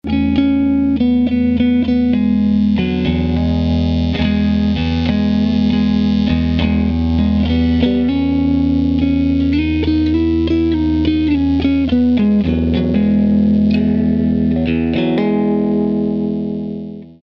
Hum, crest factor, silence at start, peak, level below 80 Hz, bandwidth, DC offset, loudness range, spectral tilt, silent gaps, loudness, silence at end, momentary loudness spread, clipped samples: none; 12 dB; 0.05 s; -2 dBFS; -28 dBFS; 6.2 kHz; under 0.1%; 1 LU; -9 dB/octave; none; -15 LUFS; 0.1 s; 3 LU; under 0.1%